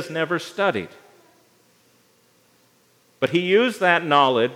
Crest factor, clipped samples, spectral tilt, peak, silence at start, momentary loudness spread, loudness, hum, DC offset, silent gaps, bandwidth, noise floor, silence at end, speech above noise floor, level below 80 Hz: 22 dB; under 0.1%; -5 dB/octave; -2 dBFS; 0 s; 10 LU; -20 LUFS; 60 Hz at -60 dBFS; under 0.1%; none; 16 kHz; -60 dBFS; 0 s; 40 dB; -78 dBFS